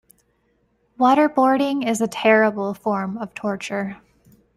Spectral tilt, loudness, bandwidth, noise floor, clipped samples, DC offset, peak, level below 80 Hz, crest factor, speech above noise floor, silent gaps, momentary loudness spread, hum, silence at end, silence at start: -5 dB/octave; -20 LUFS; 15 kHz; -65 dBFS; under 0.1%; under 0.1%; -4 dBFS; -64 dBFS; 18 dB; 46 dB; none; 12 LU; none; 0.6 s; 1 s